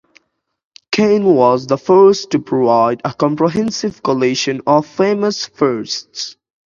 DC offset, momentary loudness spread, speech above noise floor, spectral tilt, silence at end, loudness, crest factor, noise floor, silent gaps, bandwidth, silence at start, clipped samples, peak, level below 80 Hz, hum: under 0.1%; 10 LU; 52 dB; -5 dB/octave; 0.35 s; -14 LUFS; 14 dB; -66 dBFS; none; 7.4 kHz; 0.9 s; under 0.1%; 0 dBFS; -56 dBFS; none